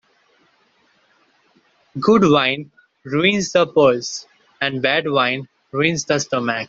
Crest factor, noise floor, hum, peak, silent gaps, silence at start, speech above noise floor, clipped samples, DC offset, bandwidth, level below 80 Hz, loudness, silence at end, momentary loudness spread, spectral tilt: 18 dB; -60 dBFS; none; -2 dBFS; none; 1.95 s; 42 dB; under 0.1%; under 0.1%; 7.8 kHz; -58 dBFS; -18 LUFS; 0.05 s; 13 LU; -4.5 dB/octave